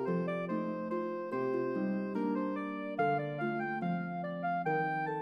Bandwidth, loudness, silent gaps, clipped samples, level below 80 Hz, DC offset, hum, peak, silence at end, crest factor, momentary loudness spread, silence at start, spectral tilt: 6 kHz; -35 LUFS; none; under 0.1%; -88 dBFS; under 0.1%; none; -20 dBFS; 0 s; 14 dB; 4 LU; 0 s; -9 dB/octave